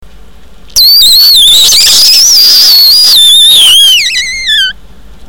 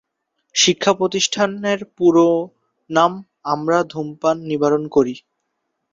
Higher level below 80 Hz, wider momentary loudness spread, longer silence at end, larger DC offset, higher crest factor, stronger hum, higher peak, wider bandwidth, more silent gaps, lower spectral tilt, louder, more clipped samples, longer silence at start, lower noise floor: first, -36 dBFS vs -60 dBFS; about the same, 8 LU vs 9 LU; second, 0.55 s vs 0.75 s; neither; second, 4 dB vs 18 dB; neither; about the same, 0 dBFS vs -2 dBFS; first, over 20 kHz vs 7.8 kHz; neither; second, 3 dB/octave vs -3.5 dB/octave; first, 0 LUFS vs -18 LUFS; first, 3% vs under 0.1%; first, 0.75 s vs 0.55 s; second, -34 dBFS vs -74 dBFS